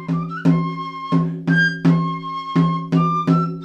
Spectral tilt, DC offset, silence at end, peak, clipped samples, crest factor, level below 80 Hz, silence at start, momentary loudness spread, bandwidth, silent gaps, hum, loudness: -8 dB/octave; under 0.1%; 0 s; -4 dBFS; under 0.1%; 16 dB; -64 dBFS; 0 s; 8 LU; 6.8 kHz; none; none; -19 LUFS